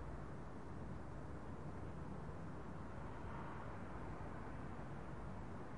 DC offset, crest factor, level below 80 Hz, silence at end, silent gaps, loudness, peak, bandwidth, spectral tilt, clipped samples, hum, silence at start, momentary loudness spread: 0.2%; 12 dB; -58 dBFS; 0 s; none; -51 LUFS; -38 dBFS; 11 kHz; -8 dB/octave; under 0.1%; none; 0 s; 2 LU